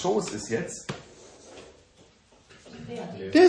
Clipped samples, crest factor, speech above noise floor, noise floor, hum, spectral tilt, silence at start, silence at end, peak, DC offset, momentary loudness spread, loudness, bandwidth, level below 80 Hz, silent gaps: under 0.1%; 20 dB; 34 dB; -58 dBFS; none; -5 dB/octave; 0 s; 0 s; -6 dBFS; under 0.1%; 23 LU; -31 LUFS; 10 kHz; -62 dBFS; none